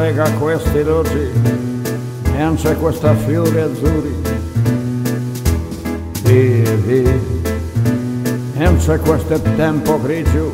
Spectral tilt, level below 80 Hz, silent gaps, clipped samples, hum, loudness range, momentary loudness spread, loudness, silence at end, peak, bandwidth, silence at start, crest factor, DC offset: -7 dB/octave; -26 dBFS; none; under 0.1%; none; 2 LU; 6 LU; -16 LUFS; 0 s; 0 dBFS; 16.5 kHz; 0 s; 14 dB; under 0.1%